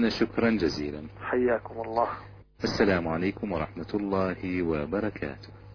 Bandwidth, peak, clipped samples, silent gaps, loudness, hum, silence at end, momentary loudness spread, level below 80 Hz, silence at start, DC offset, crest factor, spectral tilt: 5.4 kHz; -10 dBFS; under 0.1%; none; -29 LUFS; 50 Hz at -50 dBFS; 0 s; 11 LU; -50 dBFS; 0 s; under 0.1%; 18 dB; -6.5 dB/octave